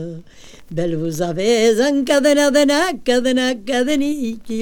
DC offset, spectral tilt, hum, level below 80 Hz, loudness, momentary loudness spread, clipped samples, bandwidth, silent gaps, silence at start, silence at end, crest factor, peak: under 0.1%; -4 dB/octave; none; -48 dBFS; -17 LUFS; 11 LU; under 0.1%; 18.5 kHz; none; 0 s; 0 s; 16 dB; -2 dBFS